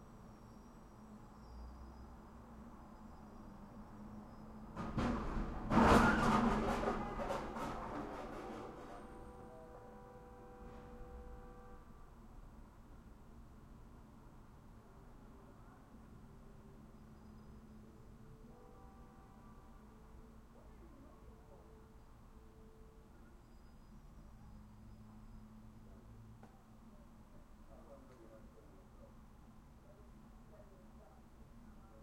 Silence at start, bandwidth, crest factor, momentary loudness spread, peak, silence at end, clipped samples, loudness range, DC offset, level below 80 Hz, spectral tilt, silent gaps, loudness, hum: 0 s; 16 kHz; 28 dB; 22 LU; -16 dBFS; 0 s; under 0.1%; 26 LU; under 0.1%; -54 dBFS; -6 dB/octave; none; -38 LUFS; none